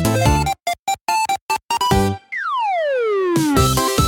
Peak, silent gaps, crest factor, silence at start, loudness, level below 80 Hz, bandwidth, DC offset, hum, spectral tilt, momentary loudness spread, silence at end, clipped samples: -2 dBFS; 0.79-0.86 s, 1.01-1.06 s, 1.41-1.49 s, 1.64-1.69 s; 16 dB; 0 s; -18 LUFS; -32 dBFS; 17.5 kHz; under 0.1%; none; -4.5 dB/octave; 7 LU; 0 s; under 0.1%